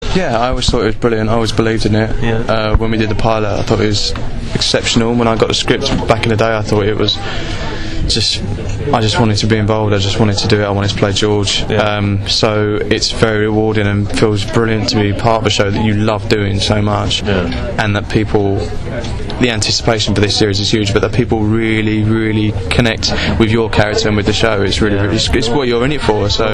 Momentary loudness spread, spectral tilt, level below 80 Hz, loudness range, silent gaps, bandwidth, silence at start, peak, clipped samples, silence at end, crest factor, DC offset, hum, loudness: 4 LU; -5 dB/octave; -24 dBFS; 2 LU; none; 11 kHz; 0 s; 0 dBFS; under 0.1%; 0 s; 12 dB; under 0.1%; none; -14 LUFS